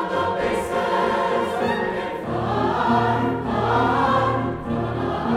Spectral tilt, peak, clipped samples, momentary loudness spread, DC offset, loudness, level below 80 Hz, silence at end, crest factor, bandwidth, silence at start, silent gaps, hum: -6.5 dB/octave; -8 dBFS; under 0.1%; 6 LU; under 0.1%; -22 LUFS; -44 dBFS; 0 s; 14 dB; 14.5 kHz; 0 s; none; none